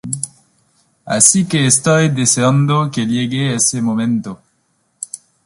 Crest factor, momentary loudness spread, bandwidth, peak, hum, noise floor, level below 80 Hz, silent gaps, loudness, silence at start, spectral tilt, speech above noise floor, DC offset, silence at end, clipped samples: 16 dB; 18 LU; 14.5 kHz; 0 dBFS; none; -63 dBFS; -54 dBFS; none; -14 LUFS; 0.05 s; -4 dB/octave; 49 dB; under 0.1%; 0.3 s; under 0.1%